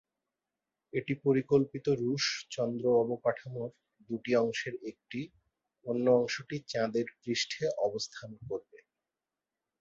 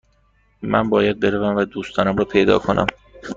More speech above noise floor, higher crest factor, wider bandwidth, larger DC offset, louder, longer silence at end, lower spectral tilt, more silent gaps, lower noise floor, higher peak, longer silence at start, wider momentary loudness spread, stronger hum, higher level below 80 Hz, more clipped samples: first, over 58 dB vs 41 dB; about the same, 20 dB vs 18 dB; about the same, 7.8 kHz vs 7.6 kHz; neither; second, -32 LUFS vs -19 LUFS; first, 1.05 s vs 0 s; second, -5 dB/octave vs -6.5 dB/octave; neither; first, under -90 dBFS vs -59 dBFS; second, -14 dBFS vs -2 dBFS; first, 0.95 s vs 0.6 s; first, 14 LU vs 8 LU; neither; second, -70 dBFS vs -46 dBFS; neither